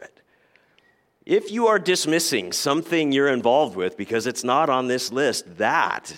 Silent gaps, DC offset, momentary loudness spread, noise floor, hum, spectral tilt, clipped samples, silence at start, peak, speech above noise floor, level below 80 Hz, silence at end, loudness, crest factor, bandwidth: none; under 0.1%; 5 LU; -62 dBFS; none; -3 dB/octave; under 0.1%; 0 s; -6 dBFS; 40 dB; -72 dBFS; 0 s; -21 LUFS; 18 dB; 16.5 kHz